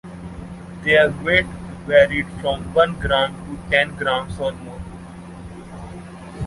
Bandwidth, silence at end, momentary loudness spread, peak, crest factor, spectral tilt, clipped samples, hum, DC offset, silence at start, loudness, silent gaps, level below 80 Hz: 11.5 kHz; 0 s; 21 LU; -2 dBFS; 20 dB; -5.5 dB/octave; under 0.1%; none; under 0.1%; 0.05 s; -19 LUFS; none; -40 dBFS